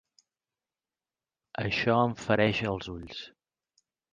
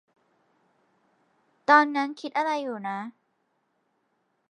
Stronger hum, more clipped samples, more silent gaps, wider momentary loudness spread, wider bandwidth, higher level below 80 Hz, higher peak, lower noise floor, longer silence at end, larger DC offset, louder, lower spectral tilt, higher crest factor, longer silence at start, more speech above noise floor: neither; neither; neither; about the same, 17 LU vs 15 LU; about the same, 9.4 kHz vs 9.8 kHz; first, -56 dBFS vs under -90 dBFS; second, -10 dBFS vs -4 dBFS; first, under -90 dBFS vs -74 dBFS; second, 0.85 s vs 1.4 s; neither; second, -28 LUFS vs -25 LUFS; first, -6 dB/octave vs -4.5 dB/octave; about the same, 22 dB vs 24 dB; about the same, 1.6 s vs 1.7 s; first, over 62 dB vs 49 dB